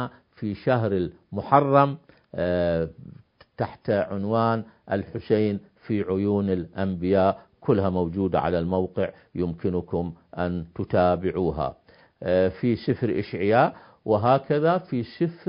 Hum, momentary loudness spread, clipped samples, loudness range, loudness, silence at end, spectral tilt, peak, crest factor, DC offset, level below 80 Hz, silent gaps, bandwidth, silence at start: none; 11 LU; under 0.1%; 3 LU; -25 LUFS; 0.1 s; -12 dB/octave; -2 dBFS; 22 dB; under 0.1%; -46 dBFS; none; 5.4 kHz; 0 s